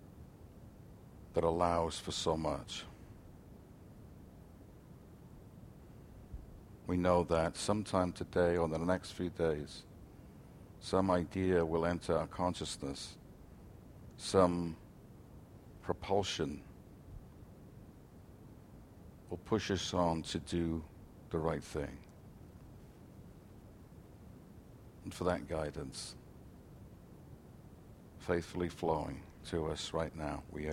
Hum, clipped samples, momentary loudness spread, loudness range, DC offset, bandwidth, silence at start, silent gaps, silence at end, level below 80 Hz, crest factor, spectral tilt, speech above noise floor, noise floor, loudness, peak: none; under 0.1%; 24 LU; 12 LU; under 0.1%; 16.5 kHz; 0 s; none; 0 s; -56 dBFS; 26 dB; -5.5 dB/octave; 21 dB; -56 dBFS; -36 LUFS; -14 dBFS